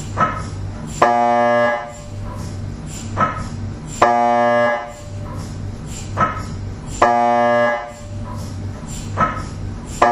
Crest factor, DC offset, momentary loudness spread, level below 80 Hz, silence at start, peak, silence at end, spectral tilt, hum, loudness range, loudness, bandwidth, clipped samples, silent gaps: 20 dB; under 0.1%; 15 LU; -36 dBFS; 0 s; 0 dBFS; 0 s; -5.5 dB/octave; none; 0 LU; -19 LUFS; 13 kHz; under 0.1%; none